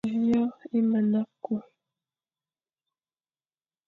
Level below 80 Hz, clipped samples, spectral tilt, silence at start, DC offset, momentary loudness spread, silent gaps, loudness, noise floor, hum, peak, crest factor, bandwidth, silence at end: -70 dBFS; under 0.1%; -9 dB/octave; 0.05 s; under 0.1%; 10 LU; none; -27 LUFS; under -90 dBFS; none; -16 dBFS; 12 dB; 4.2 kHz; 2.25 s